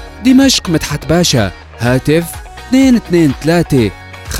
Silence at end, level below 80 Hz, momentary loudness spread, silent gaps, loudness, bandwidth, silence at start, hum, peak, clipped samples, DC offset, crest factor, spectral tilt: 0 s; -30 dBFS; 10 LU; none; -12 LUFS; 16 kHz; 0 s; none; 0 dBFS; under 0.1%; under 0.1%; 12 dB; -5 dB/octave